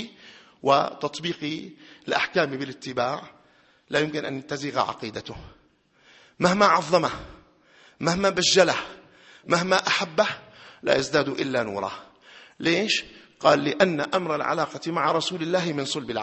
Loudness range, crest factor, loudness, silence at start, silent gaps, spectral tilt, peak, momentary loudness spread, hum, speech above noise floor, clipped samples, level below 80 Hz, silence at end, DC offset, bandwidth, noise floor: 6 LU; 24 dB; -24 LUFS; 0 s; none; -4 dB/octave; -2 dBFS; 15 LU; none; 37 dB; under 0.1%; -60 dBFS; 0 s; under 0.1%; 8.6 kHz; -61 dBFS